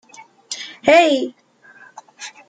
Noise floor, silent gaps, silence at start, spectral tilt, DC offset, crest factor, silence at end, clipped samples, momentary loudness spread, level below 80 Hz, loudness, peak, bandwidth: -47 dBFS; none; 0.5 s; -2.5 dB/octave; under 0.1%; 18 dB; 0.2 s; under 0.1%; 22 LU; -66 dBFS; -15 LUFS; -2 dBFS; 9.4 kHz